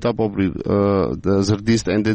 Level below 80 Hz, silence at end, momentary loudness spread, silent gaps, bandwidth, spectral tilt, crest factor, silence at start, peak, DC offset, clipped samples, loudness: -40 dBFS; 0 s; 3 LU; none; 8.6 kHz; -6.5 dB/octave; 12 dB; 0 s; -6 dBFS; under 0.1%; under 0.1%; -19 LUFS